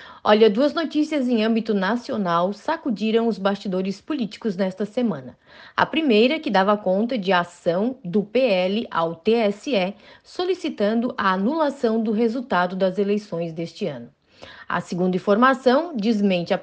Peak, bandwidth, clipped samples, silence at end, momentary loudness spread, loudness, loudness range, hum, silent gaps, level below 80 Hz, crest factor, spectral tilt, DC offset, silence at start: -2 dBFS; 8.8 kHz; under 0.1%; 0 s; 10 LU; -22 LUFS; 4 LU; none; none; -66 dBFS; 18 dB; -6.5 dB/octave; under 0.1%; 0 s